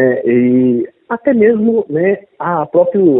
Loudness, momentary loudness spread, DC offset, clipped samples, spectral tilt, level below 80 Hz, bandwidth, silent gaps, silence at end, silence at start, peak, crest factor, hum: -13 LUFS; 8 LU; under 0.1%; under 0.1%; -13 dB/octave; -56 dBFS; 3.7 kHz; none; 0 s; 0 s; 0 dBFS; 12 dB; none